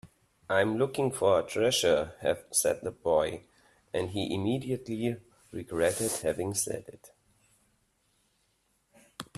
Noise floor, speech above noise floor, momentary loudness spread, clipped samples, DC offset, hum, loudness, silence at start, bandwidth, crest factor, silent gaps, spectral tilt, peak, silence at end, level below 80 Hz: -73 dBFS; 44 dB; 11 LU; under 0.1%; under 0.1%; none; -29 LUFS; 0.05 s; 15 kHz; 20 dB; none; -4 dB/octave; -10 dBFS; 0.15 s; -62 dBFS